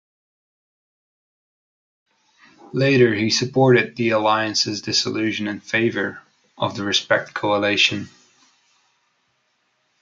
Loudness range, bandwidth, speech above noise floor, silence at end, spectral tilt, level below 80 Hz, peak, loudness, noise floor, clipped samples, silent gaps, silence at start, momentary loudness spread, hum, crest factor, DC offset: 4 LU; 7.6 kHz; 48 dB; 1.95 s; -4 dB/octave; -66 dBFS; -2 dBFS; -19 LUFS; -68 dBFS; under 0.1%; none; 2.75 s; 11 LU; none; 20 dB; under 0.1%